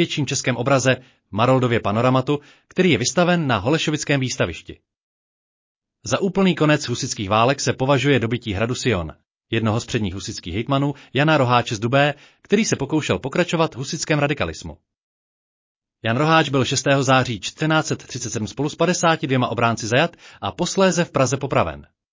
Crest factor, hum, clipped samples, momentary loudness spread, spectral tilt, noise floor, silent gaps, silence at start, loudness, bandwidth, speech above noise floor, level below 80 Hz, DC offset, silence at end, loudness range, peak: 16 dB; none; under 0.1%; 10 LU; -5 dB/octave; under -90 dBFS; 5.03-5.80 s, 15.03-15.80 s; 0 s; -20 LUFS; 7.8 kHz; over 70 dB; -46 dBFS; under 0.1%; 0.3 s; 3 LU; -4 dBFS